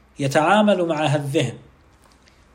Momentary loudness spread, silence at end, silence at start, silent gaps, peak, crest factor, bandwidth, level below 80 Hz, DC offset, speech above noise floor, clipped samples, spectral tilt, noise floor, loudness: 7 LU; 0.95 s; 0.2 s; none; -4 dBFS; 18 dB; 16 kHz; -58 dBFS; under 0.1%; 34 dB; under 0.1%; -5.5 dB/octave; -53 dBFS; -19 LUFS